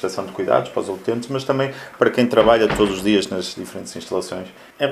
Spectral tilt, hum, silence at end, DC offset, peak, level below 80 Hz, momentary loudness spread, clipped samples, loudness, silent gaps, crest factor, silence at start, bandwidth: -5 dB/octave; none; 0 s; under 0.1%; 0 dBFS; -46 dBFS; 16 LU; under 0.1%; -20 LUFS; none; 20 dB; 0 s; 14.5 kHz